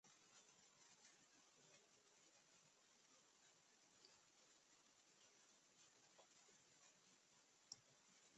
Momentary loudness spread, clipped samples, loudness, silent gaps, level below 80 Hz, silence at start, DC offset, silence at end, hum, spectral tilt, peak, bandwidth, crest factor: 7 LU; under 0.1%; -66 LUFS; none; under -90 dBFS; 0.05 s; under 0.1%; 0 s; none; -0.5 dB/octave; -40 dBFS; 8.4 kHz; 34 dB